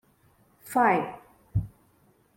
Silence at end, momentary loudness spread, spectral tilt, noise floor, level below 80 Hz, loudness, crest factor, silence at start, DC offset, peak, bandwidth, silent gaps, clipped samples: 0.7 s; 21 LU; -7 dB/octave; -63 dBFS; -50 dBFS; -27 LUFS; 20 dB; 0.65 s; under 0.1%; -10 dBFS; 16.5 kHz; none; under 0.1%